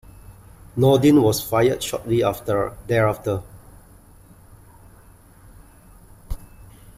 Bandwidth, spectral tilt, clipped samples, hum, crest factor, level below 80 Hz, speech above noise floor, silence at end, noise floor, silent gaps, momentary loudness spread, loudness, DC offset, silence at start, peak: 16 kHz; -6 dB/octave; under 0.1%; none; 18 dB; -42 dBFS; 30 dB; 0.6 s; -49 dBFS; none; 21 LU; -20 LUFS; under 0.1%; 0.3 s; -6 dBFS